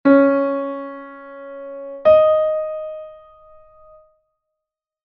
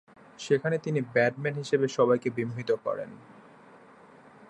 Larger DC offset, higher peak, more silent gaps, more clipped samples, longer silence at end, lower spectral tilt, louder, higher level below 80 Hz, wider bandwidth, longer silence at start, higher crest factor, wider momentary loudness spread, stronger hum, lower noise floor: neither; first, -2 dBFS vs -10 dBFS; neither; neither; first, 1.9 s vs 0.05 s; first, -8.5 dB/octave vs -6 dB/octave; first, -17 LUFS vs -28 LUFS; first, -58 dBFS vs -72 dBFS; second, 5.2 kHz vs 11 kHz; second, 0.05 s vs 0.4 s; about the same, 18 dB vs 18 dB; first, 22 LU vs 10 LU; neither; first, -85 dBFS vs -53 dBFS